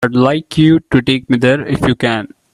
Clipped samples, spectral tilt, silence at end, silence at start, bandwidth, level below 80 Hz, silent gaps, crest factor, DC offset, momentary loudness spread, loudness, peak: under 0.1%; -7 dB/octave; 0.25 s; 0 s; 12 kHz; -40 dBFS; none; 12 dB; under 0.1%; 5 LU; -13 LUFS; 0 dBFS